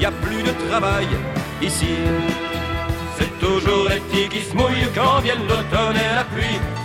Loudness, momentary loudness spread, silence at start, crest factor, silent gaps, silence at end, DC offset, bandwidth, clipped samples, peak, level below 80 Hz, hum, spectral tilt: -20 LUFS; 6 LU; 0 s; 16 dB; none; 0 s; 0.1%; 16.5 kHz; under 0.1%; -4 dBFS; -32 dBFS; none; -5 dB/octave